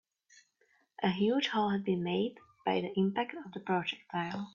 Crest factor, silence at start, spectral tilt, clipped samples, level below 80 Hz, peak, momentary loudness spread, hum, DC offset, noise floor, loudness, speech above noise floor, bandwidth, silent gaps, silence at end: 18 dB; 1 s; -6.5 dB/octave; under 0.1%; -74 dBFS; -16 dBFS; 8 LU; none; under 0.1%; -72 dBFS; -33 LUFS; 40 dB; 7.2 kHz; none; 0.05 s